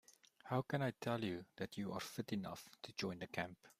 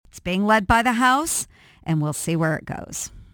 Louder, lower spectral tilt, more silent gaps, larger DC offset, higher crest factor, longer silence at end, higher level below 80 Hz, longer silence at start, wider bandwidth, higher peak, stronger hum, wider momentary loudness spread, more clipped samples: second, -45 LUFS vs -21 LUFS; first, -5.5 dB/octave vs -4 dB/octave; neither; neither; about the same, 20 dB vs 20 dB; about the same, 0.1 s vs 0.1 s; second, -78 dBFS vs -42 dBFS; about the same, 0.1 s vs 0.15 s; second, 15.5 kHz vs 19 kHz; second, -24 dBFS vs -2 dBFS; neither; second, 9 LU vs 14 LU; neither